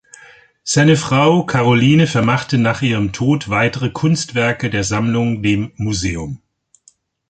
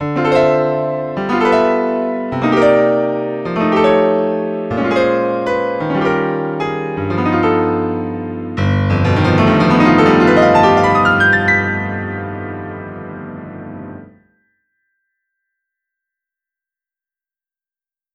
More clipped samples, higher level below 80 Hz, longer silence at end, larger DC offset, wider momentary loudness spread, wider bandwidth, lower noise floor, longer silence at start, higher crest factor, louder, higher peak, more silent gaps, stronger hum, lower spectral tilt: neither; about the same, -42 dBFS vs -44 dBFS; second, 0.95 s vs 4.05 s; neither; second, 8 LU vs 16 LU; about the same, 9.4 kHz vs 9.8 kHz; second, -54 dBFS vs under -90 dBFS; first, 0.65 s vs 0 s; about the same, 14 dB vs 14 dB; about the same, -16 LUFS vs -14 LUFS; about the same, -2 dBFS vs 0 dBFS; neither; neither; second, -5.5 dB/octave vs -7.5 dB/octave